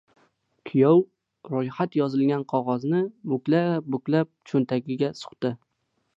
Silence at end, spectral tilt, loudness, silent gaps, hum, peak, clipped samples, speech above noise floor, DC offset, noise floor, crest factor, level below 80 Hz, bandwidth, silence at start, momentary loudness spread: 0.6 s; -8.5 dB/octave; -25 LUFS; none; none; -6 dBFS; under 0.1%; 41 dB; under 0.1%; -65 dBFS; 18 dB; -74 dBFS; 7.8 kHz; 0.65 s; 10 LU